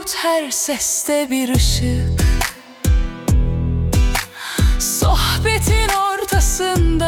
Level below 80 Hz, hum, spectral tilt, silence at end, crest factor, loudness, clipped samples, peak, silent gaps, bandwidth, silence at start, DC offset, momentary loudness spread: -20 dBFS; none; -4 dB/octave; 0 s; 14 dB; -18 LUFS; under 0.1%; -2 dBFS; none; 18 kHz; 0 s; under 0.1%; 4 LU